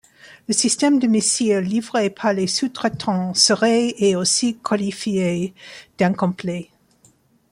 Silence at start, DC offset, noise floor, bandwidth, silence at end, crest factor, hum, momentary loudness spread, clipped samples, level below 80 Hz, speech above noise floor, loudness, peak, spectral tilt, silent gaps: 0.25 s; under 0.1%; -57 dBFS; 15.5 kHz; 0.9 s; 18 dB; none; 11 LU; under 0.1%; -62 dBFS; 37 dB; -19 LUFS; -2 dBFS; -3.5 dB/octave; none